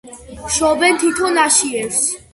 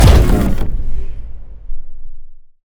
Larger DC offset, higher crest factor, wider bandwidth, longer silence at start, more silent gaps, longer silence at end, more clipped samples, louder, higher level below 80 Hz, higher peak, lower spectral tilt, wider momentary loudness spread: neither; about the same, 16 dB vs 12 dB; second, 12 kHz vs over 20 kHz; about the same, 0.05 s vs 0 s; neither; about the same, 0.15 s vs 0.15 s; second, under 0.1% vs 0.5%; about the same, -15 LUFS vs -16 LUFS; second, -44 dBFS vs -16 dBFS; about the same, 0 dBFS vs 0 dBFS; second, -1.5 dB/octave vs -6.5 dB/octave; second, 6 LU vs 24 LU